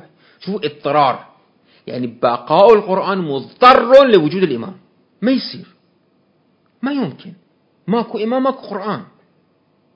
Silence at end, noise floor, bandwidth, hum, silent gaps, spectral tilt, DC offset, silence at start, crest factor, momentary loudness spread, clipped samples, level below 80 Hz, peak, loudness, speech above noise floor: 0.9 s; -59 dBFS; 8 kHz; none; none; -7.5 dB/octave; under 0.1%; 0.4 s; 16 dB; 19 LU; 0.2%; -58 dBFS; 0 dBFS; -15 LUFS; 44 dB